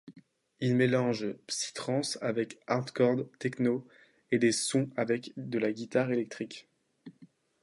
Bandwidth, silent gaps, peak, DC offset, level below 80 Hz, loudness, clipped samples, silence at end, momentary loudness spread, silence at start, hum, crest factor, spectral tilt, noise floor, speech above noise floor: 11.5 kHz; none; -12 dBFS; under 0.1%; -78 dBFS; -31 LUFS; under 0.1%; 0.4 s; 9 LU; 0.05 s; none; 18 dB; -5 dB/octave; -60 dBFS; 30 dB